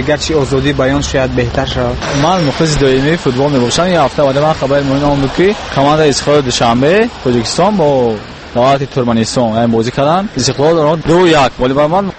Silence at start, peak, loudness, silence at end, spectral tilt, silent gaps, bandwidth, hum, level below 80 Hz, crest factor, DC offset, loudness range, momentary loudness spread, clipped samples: 0 s; 0 dBFS; -11 LUFS; 0 s; -5 dB/octave; none; 8.8 kHz; none; -30 dBFS; 10 dB; under 0.1%; 1 LU; 4 LU; under 0.1%